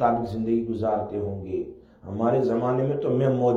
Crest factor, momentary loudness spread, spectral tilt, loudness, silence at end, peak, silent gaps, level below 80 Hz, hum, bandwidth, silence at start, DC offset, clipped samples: 16 dB; 10 LU; -9.5 dB/octave; -25 LUFS; 0 s; -8 dBFS; none; -54 dBFS; none; 7.4 kHz; 0 s; under 0.1%; under 0.1%